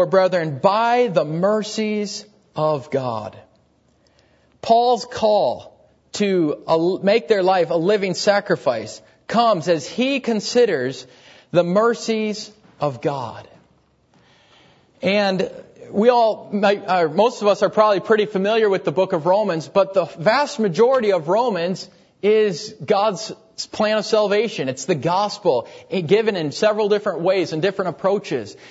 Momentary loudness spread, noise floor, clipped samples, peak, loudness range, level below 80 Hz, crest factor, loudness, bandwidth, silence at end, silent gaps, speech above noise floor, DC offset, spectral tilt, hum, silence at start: 11 LU; -59 dBFS; under 0.1%; -2 dBFS; 5 LU; -66 dBFS; 18 dB; -19 LUFS; 8 kHz; 0 s; none; 40 dB; under 0.1%; -5 dB/octave; none; 0 s